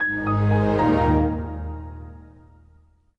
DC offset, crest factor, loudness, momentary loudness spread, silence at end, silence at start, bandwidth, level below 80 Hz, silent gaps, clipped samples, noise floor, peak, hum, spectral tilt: under 0.1%; 14 dB; -21 LUFS; 19 LU; 1 s; 0 s; 6.2 kHz; -34 dBFS; none; under 0.1%; -56 dBFS; -8 dBFS; none; -9.5 dB/octave